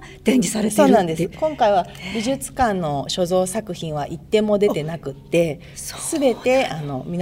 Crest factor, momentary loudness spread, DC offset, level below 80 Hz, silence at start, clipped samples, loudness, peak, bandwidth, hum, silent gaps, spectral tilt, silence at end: 18 dB; 11 LU; under 0.1%; -46 dBFS; 0 s; under 0.1%; -20 LUFS; -2 dBFS; 16 kHz; none; none; -5 dB/octave; 0 s